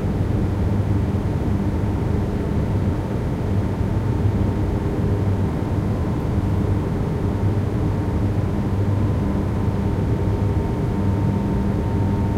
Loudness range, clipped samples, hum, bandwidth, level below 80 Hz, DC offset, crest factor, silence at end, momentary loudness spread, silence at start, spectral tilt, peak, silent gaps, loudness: 1 LU; under 0.1%; none; 10 kHz; -28 dBFS; under 0.1%; 12 dB; 0 s; 2 LU; 0 s; -9 dB/octave; -8 dBFS; none; -22 LUFS